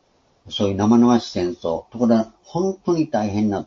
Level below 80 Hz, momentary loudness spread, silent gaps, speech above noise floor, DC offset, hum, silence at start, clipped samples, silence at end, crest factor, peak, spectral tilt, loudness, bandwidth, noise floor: -54 dBFS; 11 LU; none; 30 dB; under 0.1%; none; 0.45 s; under 0.1%; 0 s; 16 dB; -2 dBFS; -6.5 dB/octave; -20 LUFS; 7.2 kHz; -50 dBFS